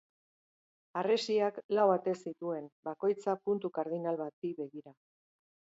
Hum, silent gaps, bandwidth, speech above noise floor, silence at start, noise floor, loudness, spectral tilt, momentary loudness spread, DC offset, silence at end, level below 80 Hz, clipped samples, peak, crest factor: none; 1.64-1.69 s, 2.72-2.83 s, 4.33-4.42 s; 8 kHz; over 57 dB; 0.95 s; under -90 dBFS; -34 LUFS; -6 dB/octave; 13 LU; under 0.1%; 0.85 s; -86 dBFS; under 0.1%; -16 dBFS; 20 dB